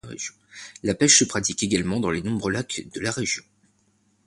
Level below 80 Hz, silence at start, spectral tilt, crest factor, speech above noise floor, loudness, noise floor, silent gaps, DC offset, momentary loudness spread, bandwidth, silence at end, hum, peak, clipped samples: -52 dBFS; 0.05 s; -3 dB/octave; 22 dB; 41 dB; -22 LUFS; -65 dBFS; none; under 0.1%; 18 LU; 11.5 kHz; 0.85 s; none; -2 dBFS; under 0.1%